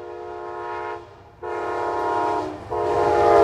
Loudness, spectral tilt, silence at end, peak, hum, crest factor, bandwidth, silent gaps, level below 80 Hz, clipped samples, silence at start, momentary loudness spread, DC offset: -24 LUFS; -6 dB/octave; 0 s; -4 dBFS; none; 20 dB; 11.5 kHz; none; -50 dBFS; under 0.1%; 0 s; 15 LU; under 0.1%